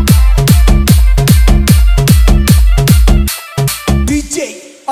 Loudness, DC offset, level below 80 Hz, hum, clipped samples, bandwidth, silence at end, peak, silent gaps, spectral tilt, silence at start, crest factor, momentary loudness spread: -10 LUFS; under 0.1%; -10 dBFS; none; 2%; 16 kHz; 0 s; 0 dBFS; none; -5.5 dB/octave; 0 s; 8 dB; 7 LU